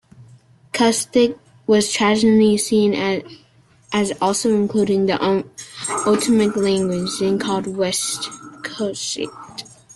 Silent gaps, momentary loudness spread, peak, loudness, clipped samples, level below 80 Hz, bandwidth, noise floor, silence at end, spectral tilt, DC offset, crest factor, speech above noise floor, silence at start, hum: none; 13 LU; -4 dBFS; -19 LUFS; under 0.1%; -58 dBFS; 12.5 kHz; -48 dBFS; 0.3 s; -4 dB/octave; under 0.1%; 14 dB; 30 dB; 0.2 s; none